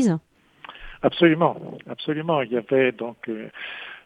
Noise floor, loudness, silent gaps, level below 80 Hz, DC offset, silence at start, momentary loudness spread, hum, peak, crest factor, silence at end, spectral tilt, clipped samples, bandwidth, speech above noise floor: -49 dBFS; -23 LUFS; none; -54 dBFS; under 0.1%; 0 s; 18 LU; none; -4 dBFS; 20 dB; 0.05 s; -6.5 dB/octave; under 0.1%; 11 kHz; 26 dB